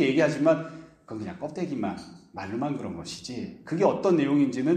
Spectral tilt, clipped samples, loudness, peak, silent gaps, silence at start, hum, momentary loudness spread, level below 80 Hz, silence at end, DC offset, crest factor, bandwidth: -6.5 dB/octave; under 0.1%; -27 LUFS; -8 dBFS; none; 0 s; none; 18 LU; -64 dBFS; 0 s; under 0.1%; 18 dB; 9.6 kHz